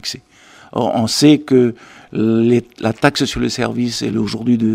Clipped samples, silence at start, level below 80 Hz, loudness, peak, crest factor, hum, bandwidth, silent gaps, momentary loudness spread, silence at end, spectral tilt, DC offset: under 0.1%; 0.05 s; -44 dBFS; -16 LUFS; 0 dBFS; 16 dB; none; 15.5 kHz; none; 14 LU; 0 s; -5 dB/octave; under 0.1%